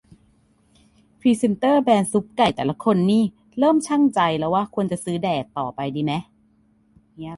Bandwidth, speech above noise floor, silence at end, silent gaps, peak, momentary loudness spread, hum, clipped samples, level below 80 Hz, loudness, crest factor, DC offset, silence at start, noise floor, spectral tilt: 11.5 kHz; 40 dB; 0 s; none; -4 dBFS; 8 LU; none; under 0.1%; -58 dBFS; -21 LUFS; 18 dB; under 0.1%; 1.25 s; -60 dBFS; -6 dB/octave